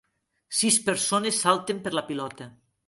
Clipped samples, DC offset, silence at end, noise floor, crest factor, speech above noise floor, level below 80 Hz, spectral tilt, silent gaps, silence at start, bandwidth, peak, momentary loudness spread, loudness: under 0.1%; under 0.1%; 0.35 s; -54 dBFS; 22 dB; 28 dB; -68 dBFS; -2.5 dB/octave; none; 0.5 s; 12 kHz; -6 dBFS; 12 LU; -24 LUFS